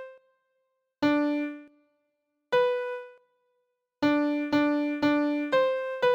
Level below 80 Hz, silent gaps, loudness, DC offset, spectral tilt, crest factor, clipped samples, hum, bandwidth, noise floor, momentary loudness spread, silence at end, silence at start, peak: -70 dBFS; none; -27 LUFS; under 0.1%; -6 dB/octave; 16 dB; under 0.1%; none; 7.6 kHz; -78 dBFS; 11 LU; 0 s; 0 s; -12 dBFS